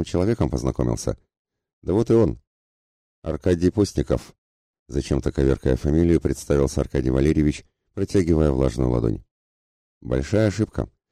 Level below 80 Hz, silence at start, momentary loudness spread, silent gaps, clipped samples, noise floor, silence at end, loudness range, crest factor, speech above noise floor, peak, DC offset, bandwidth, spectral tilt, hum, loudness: -34 dBFS; 0 s; 12 LU; 1.39-1.45 s, 1.73-1.82 s, 2.47-3.22 s, 4.38-4.86 s, 9.31-10.01 s; under 0.1%; under -90 dBFS; 0.25 s; 3 LU; 16 dB; over 69 dB; -8 dBFS; under 0.1%; 13.5 kHz; -7.5 dB/octave; none; -22 LUFS